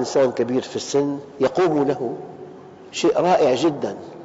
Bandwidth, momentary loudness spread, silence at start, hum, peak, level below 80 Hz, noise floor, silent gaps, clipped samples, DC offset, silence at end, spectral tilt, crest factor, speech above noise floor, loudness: 8 kHz; 15 LU; 0 s; none; -6 dBFS; -60 dBFS; -40 dBFS; none; under 0.1%; under 0.1%; 0 s; -4.5 dB/octave; 14 dB; 20 dB; -21 LUFS